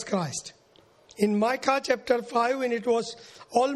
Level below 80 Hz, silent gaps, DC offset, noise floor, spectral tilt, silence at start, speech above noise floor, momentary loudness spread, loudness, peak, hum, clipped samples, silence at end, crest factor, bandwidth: -68 dBFS; none; under 0.1%; -59 dBFS; -4.5 dB/octave; 0 s; 33 dB; 12 LU; -26 LUFS; -6 dBFS; none; under 0.1%; 0 s; 20 dB; 13 kHz